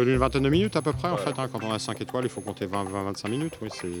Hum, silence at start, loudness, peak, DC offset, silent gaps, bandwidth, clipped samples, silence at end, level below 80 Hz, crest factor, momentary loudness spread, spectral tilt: none; 0 s; -28 LUFS; -6 dBFS; under 0.1%; none; 19.5 kHz; under 0.1%; 0 s; -44 dBFS; 20 dB; 9 LU; -6 dB/octave